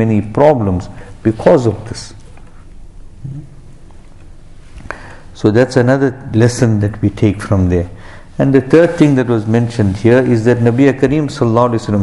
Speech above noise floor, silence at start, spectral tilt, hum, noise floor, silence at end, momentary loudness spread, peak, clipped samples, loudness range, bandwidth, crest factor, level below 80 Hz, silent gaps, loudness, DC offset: 23 dB; 0 s; -7.5 dB/octave; none; -34 dBFS; 0 s; 19 LU; 0 dBFS; under 0.1%; 13 LU; 11.5 kHz; 14 dB; -34 dBFS; none; -12 LUFS; under 0.1%